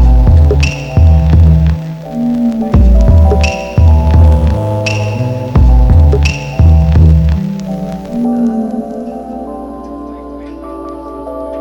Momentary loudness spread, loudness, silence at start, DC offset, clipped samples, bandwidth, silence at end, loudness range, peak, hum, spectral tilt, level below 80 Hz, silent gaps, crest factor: 17 LU; -10 LUFS; 0 s; under 0.1%; under 0.1%; 7.4 kHz; 0 s; 9 LU; 0 dBFS; none; -8 dB/octave; -12 dBFS; none; 8 dB